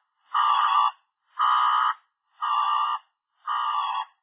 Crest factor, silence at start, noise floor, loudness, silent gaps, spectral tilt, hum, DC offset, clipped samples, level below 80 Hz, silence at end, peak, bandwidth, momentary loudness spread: 16 dB; 0.3 s; -54 dBFS; -24 LUFS; none; 1 dB/octave; none; under 0.1%; under 0.1%; under -90 dBFS; 0.2 s; -10 dBFS; 4 kHz; 13 LU